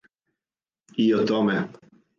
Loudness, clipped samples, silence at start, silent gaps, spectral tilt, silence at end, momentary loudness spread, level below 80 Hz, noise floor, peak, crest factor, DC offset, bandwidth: -23 LUFS; under 0.1%; 0.95 s; none; -7 dB/octave; 0.5 s; 13 LU; -70 dBFS; under -90 dBFS; -12 dBFS; 14 dB; under 0.1%; 7.2 kHz